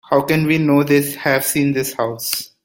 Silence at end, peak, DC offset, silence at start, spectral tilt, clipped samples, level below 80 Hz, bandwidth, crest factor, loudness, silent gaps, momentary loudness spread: 0.2 s; -2 dBFS; under 0.1%; 0.1 s; -5 dB/octave; under 0.1%; -54 dBFS; 17 kHz; 16 dB; -17 LUFS; none; 7 LU